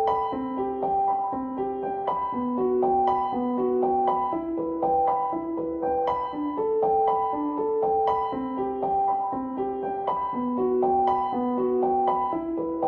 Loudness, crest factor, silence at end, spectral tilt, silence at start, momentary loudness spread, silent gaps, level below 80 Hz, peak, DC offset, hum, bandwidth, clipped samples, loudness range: -26 LUFS; 14 dB; 0 s; -9 dB/octave; 0 s; 6 LU; none; -56 dBFS; -10 dBFS; under 0.1%; none; 5.2 kHz; under 0.1%; 1 LU